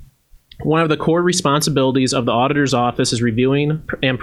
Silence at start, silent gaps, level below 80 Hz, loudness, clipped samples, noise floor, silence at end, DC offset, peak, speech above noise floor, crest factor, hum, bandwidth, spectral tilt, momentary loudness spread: 0 s; none; -46 dBFS; -17 LUFS; under 0.1%; -47 dBFS; 0 s; under 0.1%; 0 dBFS; 31 dB; 16 dB; none; 13.5 kHz; -5 dB/octave; 4 LU